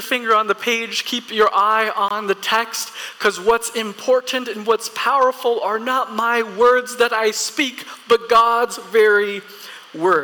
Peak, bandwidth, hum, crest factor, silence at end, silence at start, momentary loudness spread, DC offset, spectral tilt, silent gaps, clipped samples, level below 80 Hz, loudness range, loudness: -6 dBFS; 19 kHz; none; 12 dB; 0 s; 0 s; 9 LU; under 0.1%; -2 dB/octave; none; under 0.1%; -60 dBFS; 3 LU; -18 LUFS